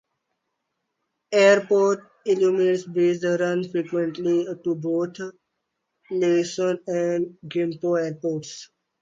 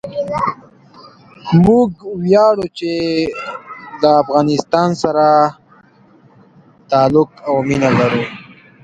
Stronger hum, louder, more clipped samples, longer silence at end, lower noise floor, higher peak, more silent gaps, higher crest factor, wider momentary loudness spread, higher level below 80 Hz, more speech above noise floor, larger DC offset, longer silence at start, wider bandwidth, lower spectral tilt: neither; second, -23 LUFS vs -14 LUFS; neither; about the same, 0.35 s vs 0.4 s; first, -78 dBFS vs -48 dBFS; second, -6 dBFS vs 0 dBFS; neither; about the same, 18 dB vs 16 dB; second, 11 LU vs 15 LU; second, -74 dBFS vs -46 dBFS; first, 56 dB vs 34 dB; neither; first, 1.3 s vs 0.05 s; second, 7.8 kHz vs 9.2 kHz; second, -5.5 dB/octave vs -7 dB/octave